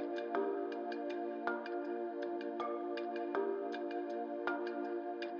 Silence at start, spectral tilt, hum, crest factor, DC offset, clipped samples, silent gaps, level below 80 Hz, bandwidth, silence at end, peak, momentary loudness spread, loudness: 0 s; -2 dB/octave; none; 18 dB; under 0.1%; under 0.1%; none; under -90 dBFS; 6.8 kHz; 0 s; -22 dBFS; 3 LU; -40 LUFS